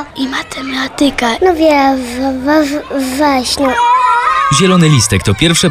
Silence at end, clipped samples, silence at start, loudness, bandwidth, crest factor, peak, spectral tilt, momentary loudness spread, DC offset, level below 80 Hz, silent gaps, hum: 0 s; under 0.1%; 0 s; -11 LUFS; 16 kHz; 12 dB; 0 dBFS; -4.5 dB/octave; 9 LU; under 0.1%; -34 dBFS; none; none